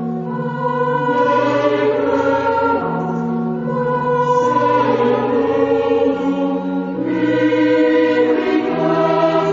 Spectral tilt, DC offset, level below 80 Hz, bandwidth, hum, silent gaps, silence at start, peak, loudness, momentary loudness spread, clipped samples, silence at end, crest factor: -7.5 dB/octave; under 0.1%; -56 dBFS; 7.6 kHz; none; none; 0 s; -2 dBFS; -16 LUFS; 6 LU; under 0.1%; 0 s; 14 dB